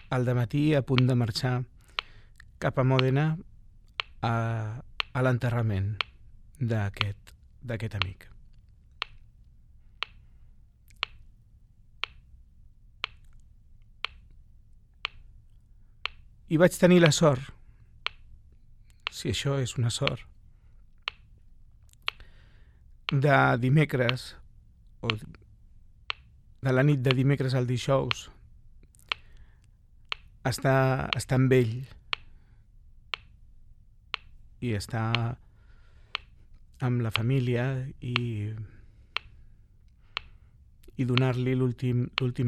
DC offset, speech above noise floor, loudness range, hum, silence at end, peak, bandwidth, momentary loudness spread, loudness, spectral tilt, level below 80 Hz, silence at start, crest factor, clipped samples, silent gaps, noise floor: under 0.1%; 30 dB; 15 LU; none; 0 s; -4 dBFS; 14.5 kHz; 15 LU; -28 LUFS; -6 dB/octave; -52 dBFS; 0.1 s; 26 dB; under 0.1%; none; -56 dBFS